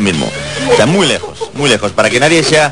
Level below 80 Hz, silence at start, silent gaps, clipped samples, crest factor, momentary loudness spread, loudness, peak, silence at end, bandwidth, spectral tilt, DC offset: -40 dBFS; 0 s; none; 0.5%; 12 dB; 9 LU; -11 LUFS; 0 dBFS; 0 s; 12 kHz; -4 dB/octave; 1%